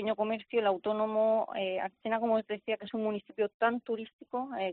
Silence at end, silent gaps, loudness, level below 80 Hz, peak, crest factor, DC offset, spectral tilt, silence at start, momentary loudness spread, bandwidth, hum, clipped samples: 0 s; 3.54-3.60 s, 4.13-4.19 s; -32 LUFS; -78 dBFS; -16 dBFS; 16 dB; under 0.1%; -3 dB/octave; 0 s; 8 LU; 4.4 kHz; none; under 0.1%